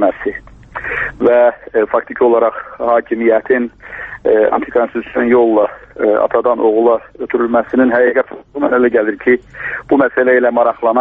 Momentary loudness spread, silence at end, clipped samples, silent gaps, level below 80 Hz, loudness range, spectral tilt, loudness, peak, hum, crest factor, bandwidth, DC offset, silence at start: 11 LU; 0 s; under 0.1%; none; -46 dBFS; 1 LU; -8.5 dB/octave; -14 LUFS; 0 dBFS; none; 12 dB; 3.9 kHz; under 0.1%; 0 s